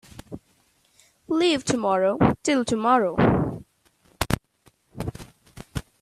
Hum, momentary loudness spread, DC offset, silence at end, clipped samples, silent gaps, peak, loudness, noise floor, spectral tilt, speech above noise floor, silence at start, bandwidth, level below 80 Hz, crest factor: none; 21 LU; under 0.1%; 0.2 s; under 0.1%; none; 0 dBFS; -23 LUFS; -64 dBFS; -5.5 dB/octave; 43 dB; 0.3 s; 15.5 kHz; -46 dBFS; 24 dB